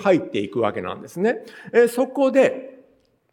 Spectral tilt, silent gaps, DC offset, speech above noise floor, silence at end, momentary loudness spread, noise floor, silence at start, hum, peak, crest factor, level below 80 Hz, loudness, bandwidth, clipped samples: -6 dB/octave; none; under 0.1%; 39 dB; 0.6 s; 13 LU; -59 dBFS; 0 s; none; -4 dBFS; 18 dB; -70 dBFS; -21 LUFS; 17 kHz; under 0.1%